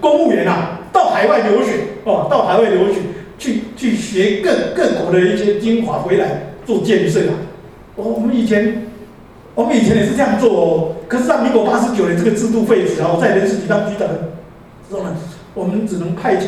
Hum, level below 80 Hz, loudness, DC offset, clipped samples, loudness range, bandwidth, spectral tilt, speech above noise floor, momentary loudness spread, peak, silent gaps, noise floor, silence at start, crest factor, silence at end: none; -46 dBFS; -15 LUFS; under 0.1%; under 0.1%; 3 LU; 13.5 kHz; -6 dB/octave; 24 dB; 12 LU; 0 dBFS; none; -39 dBFS; 0 s; 14 dB; 0 s